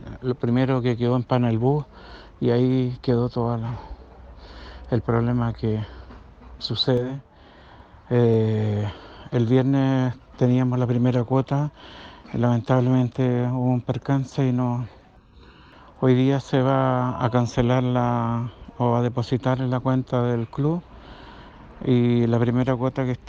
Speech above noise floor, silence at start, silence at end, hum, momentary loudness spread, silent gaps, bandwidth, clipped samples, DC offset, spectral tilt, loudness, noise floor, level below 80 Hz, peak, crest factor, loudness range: 28 dB; 0 s; 0 s; none; 13 LU; none; 7.2 kHz; under 0.1%; under 0.1%; -8.5 dB/octave; -23 LUFS; -50 dBFS; -48 dBFS; -6 dBFS; 16 dB; 4 LU